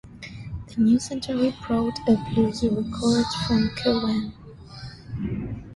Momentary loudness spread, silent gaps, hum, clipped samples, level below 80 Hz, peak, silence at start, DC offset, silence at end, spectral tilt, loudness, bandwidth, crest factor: 18 LU; none; none; under 0.1%; -44 dBFS; -8 dBFS; 0.05 s; under 0.1%; 0 s; -6 dB/octave; -24 LUFS; 11.5 kHz; 16 dB